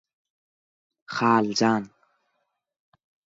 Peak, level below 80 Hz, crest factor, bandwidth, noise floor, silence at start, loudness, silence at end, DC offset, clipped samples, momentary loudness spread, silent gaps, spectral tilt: -8 dBFS; -70 dBFS; 20 dB; 7.8 kHz; -76 dBFS; 1.1 s; -23 LUFS; 1.4 s; under 0.1%; under 0.1%; 13 LU; none; -4.5 dB/octave